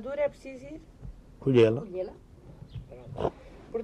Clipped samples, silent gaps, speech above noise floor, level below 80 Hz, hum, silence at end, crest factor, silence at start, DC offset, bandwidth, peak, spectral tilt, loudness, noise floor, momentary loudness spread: under 0.1%; none; 21 dB; -52 dBFS; none; 0 s; 20 dB; 0 s; under 0.1%; 9.4 kHz; -10 dBFS; -8 dB/octave; -28 LUFS; -49 dBFS; 26 LU